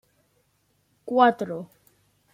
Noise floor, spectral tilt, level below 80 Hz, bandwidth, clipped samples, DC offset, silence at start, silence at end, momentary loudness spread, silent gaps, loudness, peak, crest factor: -69 dBFS; -6.5 dB/octave; -72 dBFS; 15.5 kHz; under 0.1%; under 0.1%; 1.05 s; 0.7 s; 25 LU; none; -22 LUFS; -4 dBFS; 24 dB